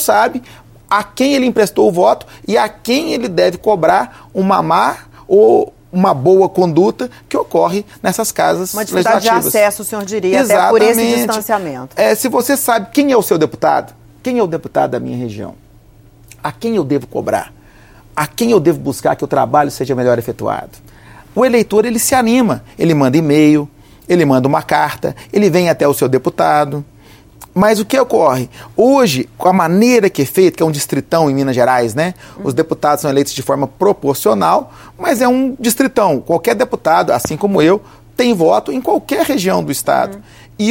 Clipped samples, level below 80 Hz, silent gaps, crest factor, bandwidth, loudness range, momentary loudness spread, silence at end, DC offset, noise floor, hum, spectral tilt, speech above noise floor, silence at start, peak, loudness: under 0.1%; -48 dBFS; none; 14 dB; 17 kHz; 4 LU; 9 LU; 0 s; under 0.1%; -43 dBFS; none; -5 dB/octave; 30 dB; 0 s; 0 dBFS; -13 LUFS